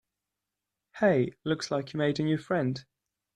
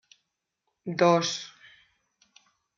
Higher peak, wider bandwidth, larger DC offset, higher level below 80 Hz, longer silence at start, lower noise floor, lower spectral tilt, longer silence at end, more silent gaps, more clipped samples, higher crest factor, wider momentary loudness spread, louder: about the same, -10 dBFS vs -8 dBFS; first, 10.5 kHz vs 7.4 kHz; neither; first, -66 dBFS vs -78 dBFS; about the same, 0.95 s vs 0.85 s; first, -87 dBFS vs -81 dBFS; first, -6.5 dB/octave vs -4.5 dB/octave; second, 0.55 s vs 1.3 s; neither; neither; about the same, 20 dB vs 22 dB; second, 7 LU vs 20 LU; second, -29 LUFS vs -25 LUFS